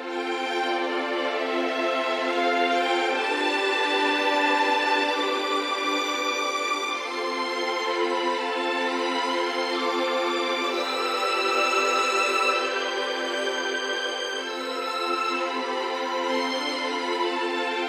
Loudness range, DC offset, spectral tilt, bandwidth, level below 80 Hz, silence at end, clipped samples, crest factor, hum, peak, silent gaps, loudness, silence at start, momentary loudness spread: 4 LU; under 0.1%; -0.5 dB/octave; 15.5 kHz; -78 dBFS; 0 s; under 0.1%; 16 dB; none; -10 dBFS; none; -25 LUFS; 0 s; 6 LU